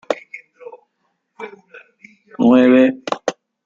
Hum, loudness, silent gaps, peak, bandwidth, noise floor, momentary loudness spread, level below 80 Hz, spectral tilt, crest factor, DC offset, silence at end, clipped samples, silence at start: none; -15 LUFS; none; -2 dBFS; 7.6 kHz; -70 dBFS; 25 LU; -62 dBFS; -6 dB/octave; 16 dB; under 0.1%; 0.35 s; under 0.1%; 0.1 s